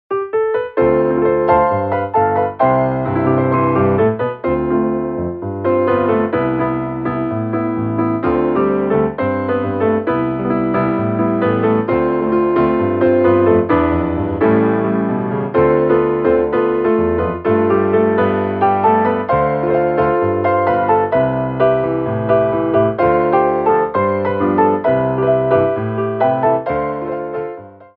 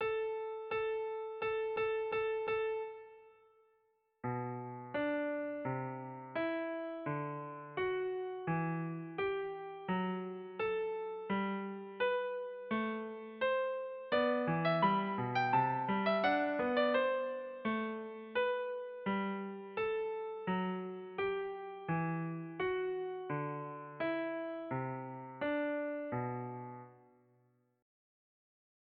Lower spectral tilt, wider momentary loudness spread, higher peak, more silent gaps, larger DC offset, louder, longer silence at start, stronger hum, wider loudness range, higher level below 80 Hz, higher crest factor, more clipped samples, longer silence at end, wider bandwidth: first, -11.5 dB/octave vs -4.5 dB/octave; second, 6 LU vs 11 LU; first, 0 dBFS vs -20 dBFS; neither; neither; first, -16 LUFS vs -37 LUFS; about the same, 0.1 s vs 0 s; neither; second, 3 LU vs 7 LU; first, -42 dBFS vs -74 dBFS; about the same, 14 dB vs 18 dB; neither; second, 0.15 s vs 1.85 s; second, 4.6 kHz vs 5.8 kHz